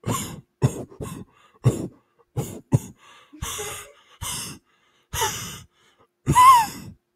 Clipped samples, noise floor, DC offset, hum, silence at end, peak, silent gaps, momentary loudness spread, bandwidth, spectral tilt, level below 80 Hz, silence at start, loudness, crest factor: under 0.1%; -64 dBFS; under 0.1%; none; 0.25 s; -2 dBFS; none; 22 LU; 16 kHz; -4 dB/octave; -48 dBFS; 0.05 s; -22 LUFS; 22 dB